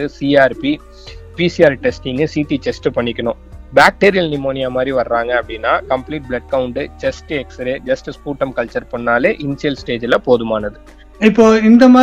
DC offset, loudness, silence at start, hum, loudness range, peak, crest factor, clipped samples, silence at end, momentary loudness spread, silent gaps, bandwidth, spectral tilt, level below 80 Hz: under 0.1%; -15 LUFS; 0 s; none; 5 LU; 0 dBFS; 14 dB; 0.4%; 0 s; 13 LU; none; 11.5 kHz; -6 dB/octave; -38 dBFS